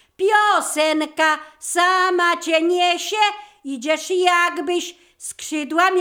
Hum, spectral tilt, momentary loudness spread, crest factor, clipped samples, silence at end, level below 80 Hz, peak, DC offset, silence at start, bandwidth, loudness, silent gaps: none; 0 dB/octave; 13 LU; 18 dB; under 0.1%; 0 s; -70 dBFS; -2 dBFS; under 0.1%; 0.2 s; 19.5 kHz; -18 LUFS; none